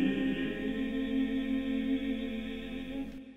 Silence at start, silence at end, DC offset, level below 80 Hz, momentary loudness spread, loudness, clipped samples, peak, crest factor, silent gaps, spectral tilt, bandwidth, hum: 0 s; 0 s; 0.3%; -52 dBFS; 8 LU; -34 LUFS; under 0.1%; -20 dBFS; 14 dB; none; -7 dB/octave; 7.6 kHz; none